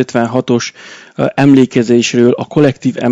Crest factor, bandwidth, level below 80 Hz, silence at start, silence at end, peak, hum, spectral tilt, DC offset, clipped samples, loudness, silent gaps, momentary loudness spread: 12 dB; 8 kHz; -52 dBFS; 0 s; 0 s; 0 dBFS; none; -6 dB/octave; under 0.1%; 1%; -11 LUFS; none; 9 LU